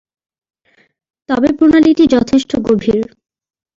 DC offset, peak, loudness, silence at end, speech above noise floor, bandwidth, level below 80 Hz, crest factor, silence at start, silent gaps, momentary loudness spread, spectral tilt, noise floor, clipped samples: under 0.1%; -2 dBFS; -12 LUFS; 0.75 s; 45 dB; 7.6 kHz; -44 dBFS; 12 dB; 1.3 s; none; 10 LU; -6 dB/octave; -56 dBFS; under 0.1%